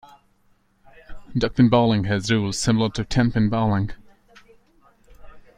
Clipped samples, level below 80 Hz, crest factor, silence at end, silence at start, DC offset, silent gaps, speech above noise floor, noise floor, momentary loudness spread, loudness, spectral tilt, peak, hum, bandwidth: under 0.1%; -42 dBFS; 18 dB; 0.15 s; 1.1 s; under 0.1%; none; 42 dB; -61 dBFS; 9 LU; -21 LUFS; -6 dB/octave; -4 dBFS; none; 11 kHz